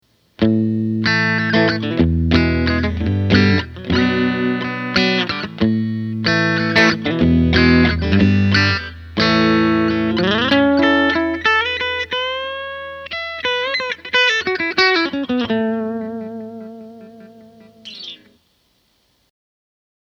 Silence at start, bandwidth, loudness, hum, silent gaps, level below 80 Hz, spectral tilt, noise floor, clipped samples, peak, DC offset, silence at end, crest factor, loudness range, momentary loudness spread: 0.4 s; 7.2 kHz; -16 LUFS; none; none; -34 dBFS; -6 dB/octave; -62 dBFS; under 0.1%; 0 dBFS; under 0.1%; 1.9 s; 18 dB; 6 LU; 12 LU